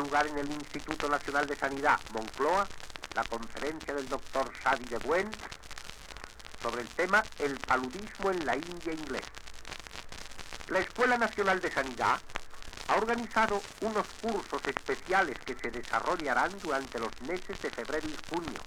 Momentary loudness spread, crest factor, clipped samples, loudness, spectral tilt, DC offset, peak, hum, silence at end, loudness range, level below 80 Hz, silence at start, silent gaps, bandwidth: 15 LU; 22 dB; under 0.1%; -32 LUFS; -3.5 dB/octave; under 0.1%; -10 dBFS; none; 0 s; 4 LU; -52 dBFS; 0 s; none; 18.5 kHz